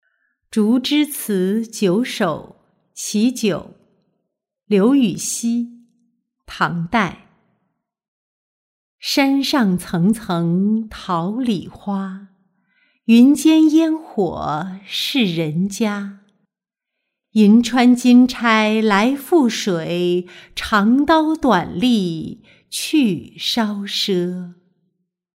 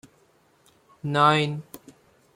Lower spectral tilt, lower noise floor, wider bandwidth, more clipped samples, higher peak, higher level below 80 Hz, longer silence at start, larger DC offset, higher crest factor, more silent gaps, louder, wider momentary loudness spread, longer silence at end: about the same, -5 dB/octave vs -5.5 dB/octave; first, -84 dBFS vs -62 dBFS; about the same, 16 kHz vs 16.5 kHz; neither; about the same, -2 dBFS vs -4 dBFS; first, -52 dBFS vs -66 dBFS; second, 0.55 s vs 1.05 s; neither; second, 16 dB vs 22 dB; first, 8.08-8.98 s vs none; first, -17 LUFS vs -22 LUFS; second, 13 LU vs 18 LU; first, 0.85 s vs 0.6 s